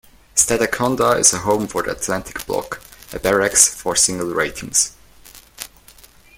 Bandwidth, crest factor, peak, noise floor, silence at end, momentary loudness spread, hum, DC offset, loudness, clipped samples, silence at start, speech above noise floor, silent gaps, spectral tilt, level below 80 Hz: 17 kHz; 20 dB; 0 dBFS; -47 dBFS; 0.7 s; 20 LU; none; under 0.1%; -17 LUFS; under 0.1%; 0.35 s; 28 dB; none; -2 dB/octave; -46 dBFS